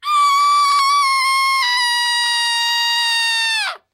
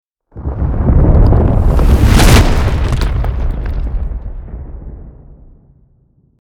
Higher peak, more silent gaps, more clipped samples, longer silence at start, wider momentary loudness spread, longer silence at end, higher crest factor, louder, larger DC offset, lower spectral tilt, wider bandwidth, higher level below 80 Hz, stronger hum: second, -6 dBFS vs 0 dBFS; neither; second, under 0.1% vs 0.3%; second, 0.05 s vs 0.35 s; second, 2 LU vs 21 LU; second, 0.15 s vs 1.05 s; about the same, 10 dB vs 12 dB; about the same, -14 LUFS vs -13 LUFS; neither; second, 7.5 dB/octave vs -6 dB/octave; second, 16 kHz vs 18 kHz; second, -84 dBFS vs -14 dBFS; neither